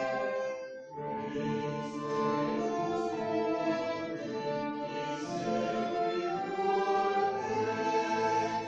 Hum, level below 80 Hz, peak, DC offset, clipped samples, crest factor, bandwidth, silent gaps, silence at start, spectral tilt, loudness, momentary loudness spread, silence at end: none; -68 dBFS; -18 dBFS; under 0.1%; under 0.1%; 14 dB; 8.2 kHz; none; 0 s; -5.5 dB/octave; -33 LUFS; 7 LU; 0 s